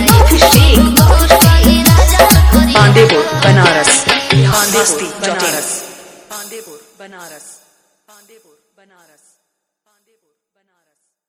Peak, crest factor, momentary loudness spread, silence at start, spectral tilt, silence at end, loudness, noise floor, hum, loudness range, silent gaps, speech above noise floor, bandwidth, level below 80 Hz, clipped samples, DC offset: 0 dBFS; 12 dB; 18 LU; 0 s; -4 dB/octave; 4 s; -9 LUFS; -70 dBFS; none; 14 LU; none; 49 dB; over 20 kHz; -18 dBFS; 1%; under 0.1%